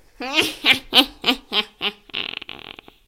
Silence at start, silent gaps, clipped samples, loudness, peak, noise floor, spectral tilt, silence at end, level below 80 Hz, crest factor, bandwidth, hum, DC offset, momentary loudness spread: 0.2 s; none; under 0.1%; -19 LUFS; 0 dBFS; -42 dBFS; -1.5 dB/octave; 0.5 s; -52 dBFS; 22 dB; 17 kHz; none; under 0.1%; 19 LU